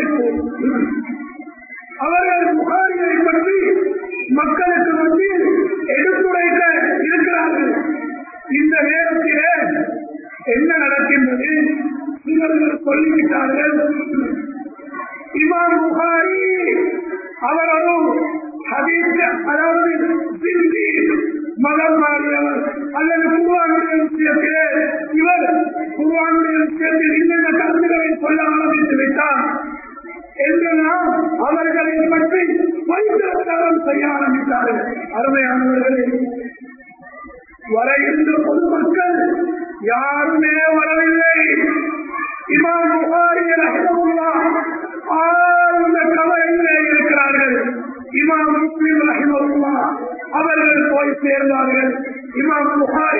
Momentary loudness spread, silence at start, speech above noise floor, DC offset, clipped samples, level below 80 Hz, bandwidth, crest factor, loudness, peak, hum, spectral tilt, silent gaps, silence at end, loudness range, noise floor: 10 LU; 0 s; 25 dB; under 0.1%; under 0.1%; -56 dBFS; 2.7 kHz; 14 dB; -15 LUFS; -2 dBFS; none; -13.5 dB/octave; none; 0 s; 3 LU; -39 dBFS